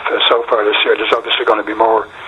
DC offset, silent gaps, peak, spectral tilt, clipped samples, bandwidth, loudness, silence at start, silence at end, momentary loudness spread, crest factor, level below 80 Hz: under 0.1%; none; 0 dBFS; -3.5 dB/octave; under 0.1%; 8.6 kHz; -13 LUFS; 0 s; 0 s; 2 LU; 14 dB; -54 dBFS